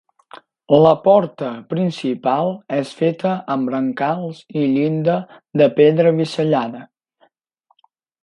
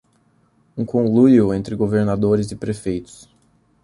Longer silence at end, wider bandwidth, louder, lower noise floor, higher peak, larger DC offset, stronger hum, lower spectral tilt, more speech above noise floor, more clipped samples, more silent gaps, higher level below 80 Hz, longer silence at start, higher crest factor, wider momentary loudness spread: first, 1.4 s vs 0.8 s; about the same, 11 kHz vs 11.5 kHz; about the same, -18 LUFS vs -18 LUFS; first, -64 dBFS vs -60 dBFS; about the same, 0 dBFS vs -2 dBFS; neither; neither; about the same, -8 dB/octave vs -8 dB/octave; first, 47 dB vs 42 dB; neither; neither; second, -62 dBFS vs -48 dBFS; second, 0.35 s vs 0.75 s; about the same, 18 dB vs 16 dB; second, 12 LU vs 15 LU